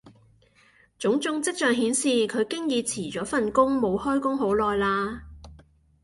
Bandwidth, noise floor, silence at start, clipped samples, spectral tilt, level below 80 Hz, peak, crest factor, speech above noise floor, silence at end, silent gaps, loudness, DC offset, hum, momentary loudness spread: 11.5 kHz; -60 dBFS; 0.05 s; under 0.1%; -3.5 dB/octave; -52 dBFS; -6 dBFS; 18 dB; 35 dB; 0.45 s; none; -25 LUFS; under 0.1%; none; 7 LU